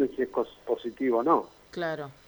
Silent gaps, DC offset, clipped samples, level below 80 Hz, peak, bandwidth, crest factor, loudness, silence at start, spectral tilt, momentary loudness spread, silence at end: none; under 0.1%; under 0.1%; -66 dBFS; -10 dBFS; over 20 kHz; 18 dB; -29 LUFS; 0 s; -7 dB/octave; 9 LU; 0.15 s